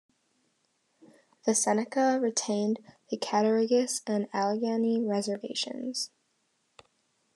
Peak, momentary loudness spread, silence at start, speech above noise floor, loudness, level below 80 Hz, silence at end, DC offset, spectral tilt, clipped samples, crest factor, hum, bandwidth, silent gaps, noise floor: -12 dBFS; 9 LU; 1.45 s; 46 dB; -29 LUFS; -90 dBFS; 1.3 s; under 0.1%; -3.5 dB/octave; under 0.1%; 18 dB; none; 12.5 kHz; none; -74 dBFS